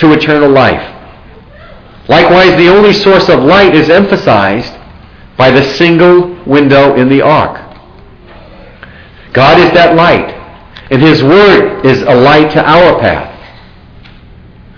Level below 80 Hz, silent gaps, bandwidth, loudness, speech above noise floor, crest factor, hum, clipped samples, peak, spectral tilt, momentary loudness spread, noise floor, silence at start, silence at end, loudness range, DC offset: -34 dBFS; none; 5.4 kHz; -5 LUFS; 29 dB; 6 dB; none; 5%; 0 dBFS; -7 dB/octave; 10 LU; -34 dBFS; 0 s; 1.4 s; 4 LU; under 0.1%